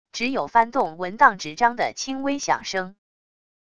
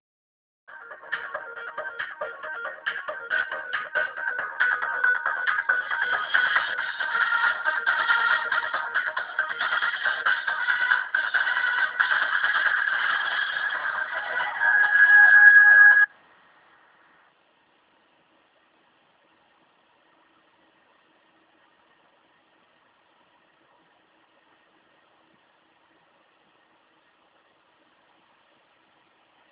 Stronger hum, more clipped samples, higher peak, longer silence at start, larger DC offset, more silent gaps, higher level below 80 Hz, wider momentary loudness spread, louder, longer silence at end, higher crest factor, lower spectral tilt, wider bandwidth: neither; neither; first, 0 dBFS vs -4 dBFS; second, 0.05 s vs 0.7 s; first, 0.6% vs under 0.1%; neither; first, -60 dBFS vs -76 dBFS; second, 9 LU vs 20 LU; about the same, -22 LUFS vs -21 LUFS; second, 0.7 s vs 13.45 s; about the same, 22 dB vs 22 dB; first, -3 dB/octave vs 4.5 dB/octave; first, 10 kHz vs 4 kHz